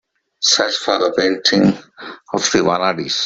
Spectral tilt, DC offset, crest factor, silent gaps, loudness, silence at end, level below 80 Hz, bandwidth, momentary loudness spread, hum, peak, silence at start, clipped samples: -3 dB/octave; under 0.1%; 16 dB; none; -16 LUFS; 0 s; -54 dBFS; 8.2 kHz; 12 LU; none; 0 dBFS; 0.4 s; under 0.1%